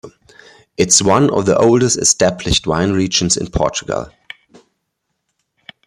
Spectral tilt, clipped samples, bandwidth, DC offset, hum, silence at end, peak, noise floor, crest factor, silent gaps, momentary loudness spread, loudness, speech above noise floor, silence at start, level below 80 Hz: -3.5 dB/octave; under 0.1%; 14.5 kHz; under 0.1%; none; 1.8 s; 0 dBFS; -73 dBFS; 16 dB; none; 11 LU; -14 LUFS; 59 dB; 0.05 s; -38 dBFS